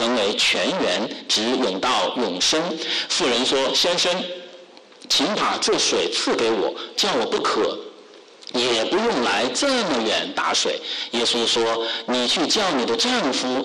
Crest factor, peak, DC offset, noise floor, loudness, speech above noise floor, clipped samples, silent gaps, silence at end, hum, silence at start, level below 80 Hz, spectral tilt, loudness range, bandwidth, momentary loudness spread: 10 dB; -12 dBFS; under 0.1%; -46 dBFS; -20 LUFS; 24 dB; under 0.1%; none; 0 s; none; 0 s; -58 dBFS; -2 dB/octave; 2 LU; 12.5 kHz; 6 LU